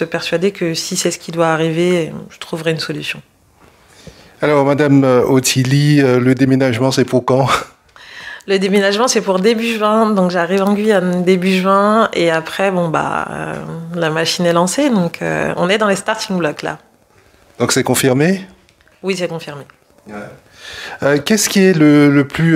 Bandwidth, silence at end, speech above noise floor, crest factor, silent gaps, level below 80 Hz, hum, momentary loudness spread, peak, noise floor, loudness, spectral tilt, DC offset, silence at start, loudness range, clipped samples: 16 kHz; 0 s; 36 dB; 14 dB; none; -52 dBFS; none; 15 LU; 0 dBFS; -50 dBFS; -14 LUFS; -5 dB/octave; under 0.1%; 0 s; 6 LU; under 0.1%